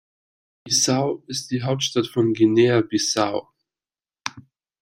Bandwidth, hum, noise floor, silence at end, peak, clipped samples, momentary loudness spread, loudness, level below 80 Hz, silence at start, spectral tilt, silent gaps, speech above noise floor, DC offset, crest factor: 15.5 kHz; none; under -90 dBFS; 0.4 s; -4 dBFS; under 0.1%; 15 LU; -21 LUFS; -62 dBFS; 0.65 s; -4 dB/octave; none; over 70 dB; under 0.1%; 20 dB